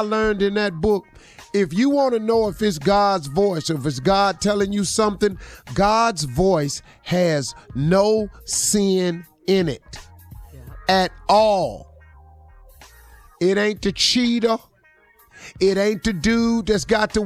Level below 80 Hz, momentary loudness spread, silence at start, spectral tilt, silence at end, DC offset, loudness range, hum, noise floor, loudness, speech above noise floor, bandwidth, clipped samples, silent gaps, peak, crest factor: -42 dBFS; 9 LU; 0 s; -4.5 dB/octave; 0 s; under 0.1%; 3 LU; none; -56 dBFS; -20 LUFS; 36 dB; 15.5 kHz; under 0.1%; none; -6 dBFS; 14 dB